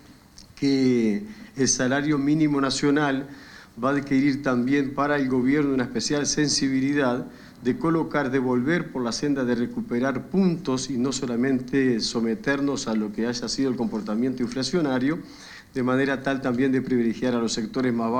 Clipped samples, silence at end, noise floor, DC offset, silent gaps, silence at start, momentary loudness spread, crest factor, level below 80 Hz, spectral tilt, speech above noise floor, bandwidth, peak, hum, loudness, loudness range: under 0.1%; 0 s; -49 dBFS; under 0.1%; none; 0.1 s; 6 LU; 14 dB; -54 dBFS; -4.5 dB/octave; 25 dB; 10 kHz; -8 dBFS; none; -24 LUFS; 2 LU